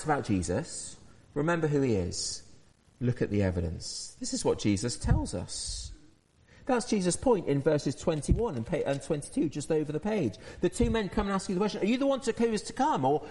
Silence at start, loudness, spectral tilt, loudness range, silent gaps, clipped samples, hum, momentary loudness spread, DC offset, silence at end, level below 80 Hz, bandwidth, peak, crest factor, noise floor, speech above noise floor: 0 s; -30 LUFS; -5.5 dB/octave; 2 LU; none; under 0.1%; none; 8 LU; under 0.1%; 0 s; -44 dBFS; 11.5 kHz; -10 dBFS; 20 dB; -60 dBFS; 31 dB